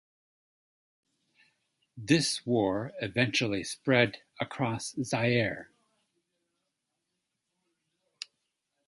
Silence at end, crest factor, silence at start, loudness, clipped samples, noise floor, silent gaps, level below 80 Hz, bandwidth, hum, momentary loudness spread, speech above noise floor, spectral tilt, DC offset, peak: 3.25 s; 24 dB; 1.95 s; -29 LUFS; under 0.1%; -83 dBFS; none; -66 dBFS; 11.5 kHz; none; 19 LU; 54 dB; -4.5 dB/octave; under 0.1%; -10 dBFS